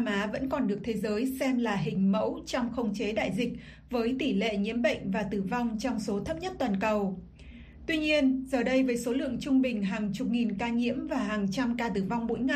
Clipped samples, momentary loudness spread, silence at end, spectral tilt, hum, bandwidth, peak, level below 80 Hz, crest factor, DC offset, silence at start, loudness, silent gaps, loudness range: under 0.1%; 6 LU; 0 s; -6 dB/octave; none; 15 kHz; -14 dBFS; -52 dBFS; 16 dB; under 0.1%; 0 s; -30 LUFS; none; 2 LU